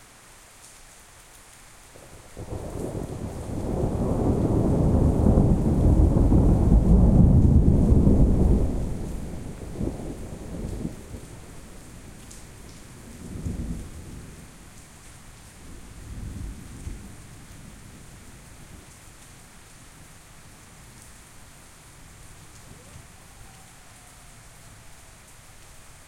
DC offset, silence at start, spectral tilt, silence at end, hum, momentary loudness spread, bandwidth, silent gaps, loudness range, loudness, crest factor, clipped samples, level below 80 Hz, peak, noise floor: under 0.1%; 2.3 s; -8.5 dB/octave; 0.25 s; none; 27 LU; 14.5 kHz; none; 27 LU; -23 LUFS; 20 dB; under 0.1%; -30 dBFS; -4 dBFS; -50 dBFS